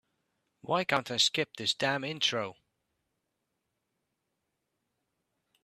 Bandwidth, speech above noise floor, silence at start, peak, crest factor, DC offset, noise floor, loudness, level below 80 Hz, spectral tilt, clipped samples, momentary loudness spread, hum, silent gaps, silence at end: 14.5 kHz; 52 dB; 0.65 s; -10 dBFS; 26 dB; under 0.1%; -83 dBFS; -29 LUFS; -78 dBFS; -2.5 dB/octave; under 0.1%; 9 LU; none; none; 3.1 s